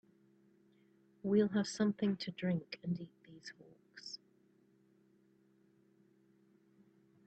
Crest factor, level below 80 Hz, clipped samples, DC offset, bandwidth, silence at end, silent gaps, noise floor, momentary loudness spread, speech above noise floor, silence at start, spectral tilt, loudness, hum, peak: 22 dB; -82 dBFS; under 0.1%; under 0.1%; 8.8 kHz; 3.1 s; none; -71 dBFS; 21 LU; 34 dB; 1.25 s; -6 dB/octave; -37 LUFS; none; -20 dBFS